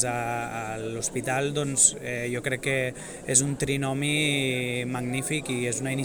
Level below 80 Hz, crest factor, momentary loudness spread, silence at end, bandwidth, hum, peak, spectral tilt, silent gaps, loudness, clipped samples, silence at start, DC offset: -54 dBFS; 24 dB; 11 LU; 0 s; over 20 kHz; none; -4 dBFS; -3 dB/octave; none; -26 LUFS; under 0.1%; 0 s; under 0.1%